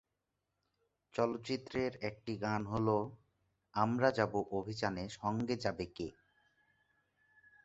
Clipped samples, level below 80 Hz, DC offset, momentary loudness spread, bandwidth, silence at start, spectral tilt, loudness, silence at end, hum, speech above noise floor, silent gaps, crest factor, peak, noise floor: under 0.1%; -64 dBFS; under 0.1%; 11 LU; 8 kHz; 1.15 s; -5 dB/octave; -37 LUFS; 1.55 s; none; 50 dB; none; 22 dB; -16 dBFS; -87 dBFS